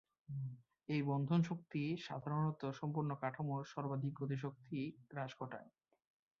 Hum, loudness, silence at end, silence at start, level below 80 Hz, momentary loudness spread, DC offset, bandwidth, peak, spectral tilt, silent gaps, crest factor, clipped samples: none; -42 LUFS; 0.7 s; 0.3 s; -78 dBFS; 11 LU; under 0.1%; 7 kHz; -24 dBFS; -7 dB/octave; none; 18 dB; under 0.1%